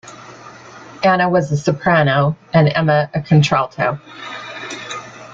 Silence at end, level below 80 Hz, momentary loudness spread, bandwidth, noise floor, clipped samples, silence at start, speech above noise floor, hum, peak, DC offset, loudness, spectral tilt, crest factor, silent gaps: 0 s; -50 dBFS; 19 LU; 7.6 kHz; -38 dBFS; under 0.1%; 0.05 s; 23 dB; none; -2 dBFS; under 0.1%; -16 LUFS; -6.5 dB/octave; 16 dB; none